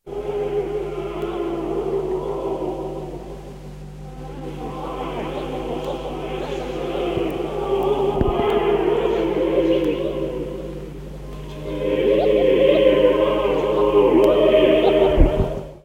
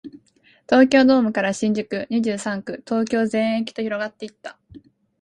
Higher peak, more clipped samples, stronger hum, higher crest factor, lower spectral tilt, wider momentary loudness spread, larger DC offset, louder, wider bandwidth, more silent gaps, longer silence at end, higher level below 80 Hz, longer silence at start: first, 0 dBFS vs -4 dBFS; neither; first, 50 Hz at -35 dBFS vs none; about the same, 20 dB vs 18 dB; first, -7 dB/octave vs -5 dB/octave; first, 19 LU vs 16 LU; neither; about the same, -20 LUFS vs -20 LUFS; first, 16 kHz vs 11 kHz; neither; second, 0.05 s vs 0.45 s; first, -32 dBFS vs -62 dBFS; about the same, 0.05 s vs 0.05 s